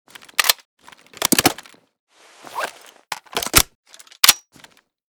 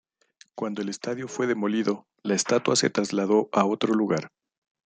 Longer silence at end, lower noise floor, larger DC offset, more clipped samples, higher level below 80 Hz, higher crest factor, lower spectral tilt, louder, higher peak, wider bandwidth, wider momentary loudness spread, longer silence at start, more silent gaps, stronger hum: about the same, 0.7 s vs 0.6 s; second, -51 dBFS vs -59 dBFS; neither; neither; first, -42 dBFS vs -72 dBFS; about the same, 22 dB vs 20 dB; second, -1 dB/octave vs -4 dB/octave; first, -18 LUFS vs -25 LUFS; first, 0 dBFS vs -6 dBFS; first, over 20 kHz vs 9.6 kHz; first, 19 LU vs 10 LU; second, 0.4 s vs 0.55 s; first, 0.65-0.77 s, 2.00-2.07 s, 3.75-3.83 s vs none; neither